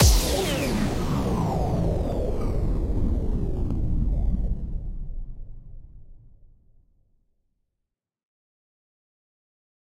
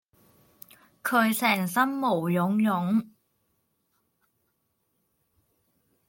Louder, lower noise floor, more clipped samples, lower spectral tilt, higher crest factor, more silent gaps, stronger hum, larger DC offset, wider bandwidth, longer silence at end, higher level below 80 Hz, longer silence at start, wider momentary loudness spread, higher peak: about the same, -27 LUFS vs -25 LUFS; first, -83 dBFS vs -75 dBFS; neither; about the same, -5 dB/octave vs -5.5 dB/octave; about the same, 20 dB vs 20 dB; neither; neither; neither; about the same, 16 kHz vs 17 kHz; first, 3.45 s vs 3.05 s; first, -28 dBFS vs -76 dBFS; second, 0 s vs 1.05 s; first, 15 LU vs 4 LU; first, -6 dBFS vs -10 dBFS